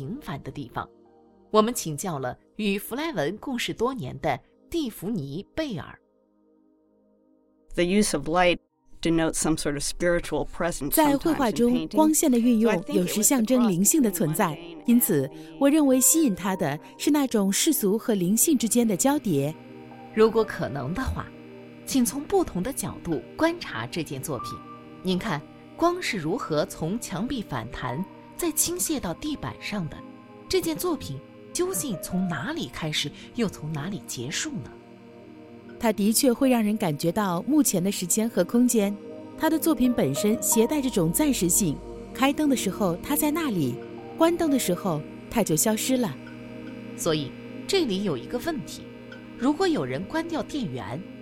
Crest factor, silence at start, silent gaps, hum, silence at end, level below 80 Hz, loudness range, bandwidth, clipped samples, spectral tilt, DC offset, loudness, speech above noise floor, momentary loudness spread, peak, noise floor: 20 dB; 0 s; none; none; 0 s; -48 dBFS; 8 LU; 17 kHz; under 0.1%; -4 dB/octave; under 0.1%; -25 LUFS; 39 dB; 14 LU; -6 dBFS; -64 dBFS